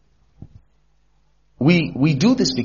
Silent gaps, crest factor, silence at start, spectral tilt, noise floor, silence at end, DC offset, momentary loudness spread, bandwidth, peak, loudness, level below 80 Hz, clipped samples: none; 18 dB; 0.4 s; -5.5 dB/octave; -62 dBFS; 0 s; 0.1%; 3 LU; 7.2 kHz; -4 dBFS; -17 LUFS; -50 dBFS; under 0.1%